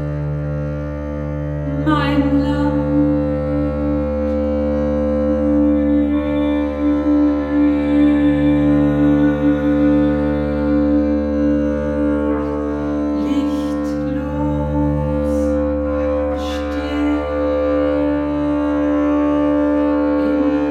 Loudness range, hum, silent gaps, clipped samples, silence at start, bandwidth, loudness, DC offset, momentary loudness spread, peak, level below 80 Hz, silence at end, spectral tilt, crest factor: 4 LU; none; none; under 0.1%; 0 s; 6.6 kHz; -17 LUFS; under 0.1%; 7 LU; -4 dBFS; -28 dBFS; 0 s; -9 dB/octave; 14 dB